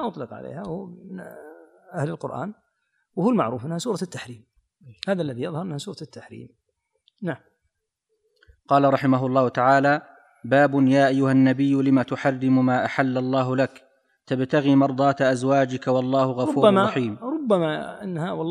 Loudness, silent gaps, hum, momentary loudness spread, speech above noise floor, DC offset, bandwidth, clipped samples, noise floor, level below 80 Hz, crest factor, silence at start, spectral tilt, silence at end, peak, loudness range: -22 LUFS; none; none; 18 LU; 55 dB; under 0.1%; 11 kHz; under 0.1%; -76 dBFS; -68 dBFS; 20 dB; 0 s; -7 dB/octave; 0 s; -4 dBFS; 13 LU